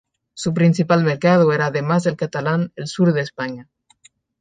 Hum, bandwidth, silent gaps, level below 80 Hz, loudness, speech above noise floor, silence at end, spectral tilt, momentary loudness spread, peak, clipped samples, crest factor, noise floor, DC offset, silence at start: none; 9.4 kHz; none; -62 dBFS; -19 LUFS; 37 dB; 0.8 s; -7 dB/octave; 11 LU; -2 dBFS; under 0.1%; 16 dB; -55 dBFS; under 0.1%; 0.35 s